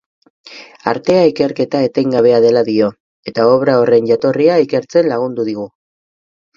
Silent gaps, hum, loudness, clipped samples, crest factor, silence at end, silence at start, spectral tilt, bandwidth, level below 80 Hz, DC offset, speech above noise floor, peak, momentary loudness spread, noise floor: 3.00-3.23 s; none; -13 LUFS; under 0.1%; 14 dB; 0.9 s; 0.45 s; -7 dB/octave; 7.2 kHz; -58 dBFS; under 0.1%; over 78 dB; 0 dBFS; 10 LU; under -90 dBFS